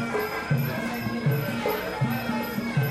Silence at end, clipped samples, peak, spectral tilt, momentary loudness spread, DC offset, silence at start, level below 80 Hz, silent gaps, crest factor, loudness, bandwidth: 0 s; under 0.1%; -14 dBFS; -6.5 dB/octave; 2 LU; under 0.1%; 0 s; -52 dBFS; none; 14 dB; -27 LUFS; 14 kHz